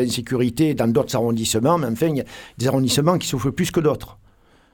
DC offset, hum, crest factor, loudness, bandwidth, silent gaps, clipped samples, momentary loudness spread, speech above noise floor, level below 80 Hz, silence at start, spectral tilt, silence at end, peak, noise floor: under 0.1%; none; 16 dB; -20 LUFS; 19 kHz; none; under 0.1%; 5 LU; 34 dB; -48 dBFS; 0 s; -5.5 dB/octave; 0.6 s; -4 dBFS; -54 dBFS